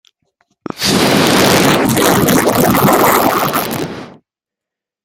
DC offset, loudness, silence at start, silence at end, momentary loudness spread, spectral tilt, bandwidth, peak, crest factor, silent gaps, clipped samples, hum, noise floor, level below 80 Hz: under 0.1%; -11 LUFS; 0.75 s; 0.95 s; 11 LU; -4 dB/octave; 17.5 kHz; 0 dBFS; 14 dB; none; under 0.1%; none; -85 dBFS; -42 dBFS